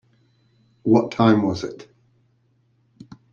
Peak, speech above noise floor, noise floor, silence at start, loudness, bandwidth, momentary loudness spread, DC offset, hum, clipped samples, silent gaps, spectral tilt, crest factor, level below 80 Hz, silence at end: -2 dBFS; 45 dB; -63 dBFS; 0.85 s; -20 LUFS; 7.2 kHz; 16 LU; under 0.1%; none; under 0.1%; none; -7.5 dB/octave; 20 dB; -60 dBFS; 1.5 s